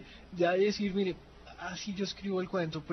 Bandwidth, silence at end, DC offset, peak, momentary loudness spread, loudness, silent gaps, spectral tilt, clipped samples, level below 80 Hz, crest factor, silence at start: 6.4 kHz; 0 s; under 0.1%; -16 dBFS; 17 LU; -33 LUFS; none; -5.5 dB/octave; under 0.1%; -58 dBFS; 16 dB; 0 s